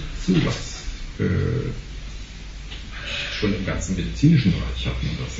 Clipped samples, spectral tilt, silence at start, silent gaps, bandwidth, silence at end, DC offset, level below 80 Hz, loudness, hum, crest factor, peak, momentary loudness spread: under 0.1%; -6 dB/octave; 0 s; none; 8 kHz; 0 s; under 0.1%; -32 dBFS; -23 LUFS; none; 18 dB; -4 dBFS; 18 LU